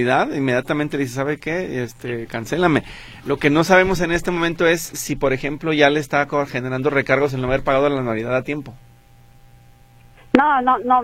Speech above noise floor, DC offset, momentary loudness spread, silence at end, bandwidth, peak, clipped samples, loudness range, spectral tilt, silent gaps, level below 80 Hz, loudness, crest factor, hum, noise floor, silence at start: 29 dB; under 0.1%; 11 LU; 0 s; 16.5 kHz; 0 dBFS; under 0.1%; 4 LU; -5.5 dB/octave; none; -42 dBFS; -19 LUFS; 20 dB; none; -48 dBFS; 0 s